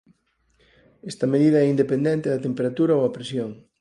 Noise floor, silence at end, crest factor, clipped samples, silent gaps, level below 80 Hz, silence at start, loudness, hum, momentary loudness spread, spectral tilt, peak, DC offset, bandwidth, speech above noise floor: -66 dBFS; 0.25 s; 16 dB; under 0.1%; none; -64 dBFS; 1.05 s; -22 LUFS; none; 13 LU; -7.5 dB/octave; -8 dBFS; under 0.1%; 11.5 kHz; 44 dB